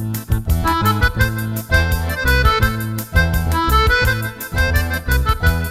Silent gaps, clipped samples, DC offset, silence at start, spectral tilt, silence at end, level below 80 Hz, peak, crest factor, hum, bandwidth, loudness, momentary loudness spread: none; under 0.1%; under 0.1%; 0 s; -5 dB/octave; 0 s; -22 dBFS; -2 dBFS; 14 dB; none; 16 kHz; -17 LUFS; 7 LU